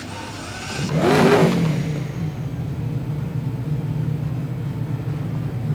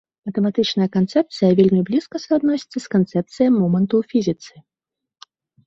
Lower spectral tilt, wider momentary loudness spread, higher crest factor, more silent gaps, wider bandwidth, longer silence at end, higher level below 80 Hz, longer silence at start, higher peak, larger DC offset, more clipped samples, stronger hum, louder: about the same, -6.5 dB/octave vs -7.5 dB/octave; first, 12 LU vs 7 LU; about the same, 18 dB vs 16 dB; neither; first, 16 kHz vs 7.8 kHz; second, 0 s vs 1.2 s; first, -42 dBFS vs -60 dBFS; second, 0 s vs 0.25 s; about the same, -4 dBFS vs -4 dBFS; neither; neither; neither; second, -22 LUFS vs -19 LUFS